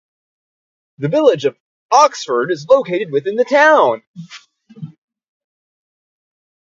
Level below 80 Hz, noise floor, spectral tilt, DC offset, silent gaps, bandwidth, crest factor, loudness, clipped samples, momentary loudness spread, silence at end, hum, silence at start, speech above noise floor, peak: -68 dBFS; -35 dBFS; -4.5 dB/octave; under 0.1%; 1.60-1.89 s, 4.07-4.14 s; 7.8 kHz; 18 dB; -14 LUFS; under 0.1%; 25 LU; 1.8 s; none; 1 s; 21 dB; 0 dBFS